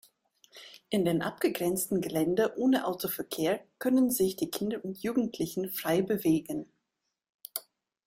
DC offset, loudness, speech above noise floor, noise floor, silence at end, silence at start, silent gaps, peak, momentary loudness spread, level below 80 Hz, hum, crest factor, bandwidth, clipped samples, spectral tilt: under 0.1%; -30 LUFS; 55 dB; -84 dBFS; 0.45 s; 0.55 s; 7.29-7.39 s; -14 dBFS; 12 LU; -68 dBFS; none; 16 dB; 16.5 kHz; under 0.1%; -5 dB/octave